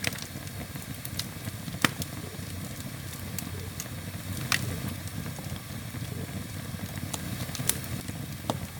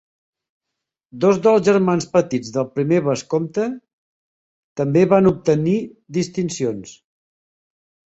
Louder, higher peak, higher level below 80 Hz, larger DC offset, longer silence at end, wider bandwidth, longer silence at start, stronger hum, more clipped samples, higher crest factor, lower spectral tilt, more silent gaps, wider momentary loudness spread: second, -34 LUFS vs -19 LUFS; about the same, 0 dBFS vs -2 dBFS; about the same, -52 dBFS vs -56 dBFS; neither; second, 0 s vs 1.2 s; first, over 20 kHz vs 8.2 kHz; second, 0 s vs 1.15 s; neither; neither; first, 34 dB vs 18 dB; second, -3.5 dB/octave vs -6.5 dB/octave; second, none vs 3.93-4.76 s; about the same, 9 LU vs 11 LU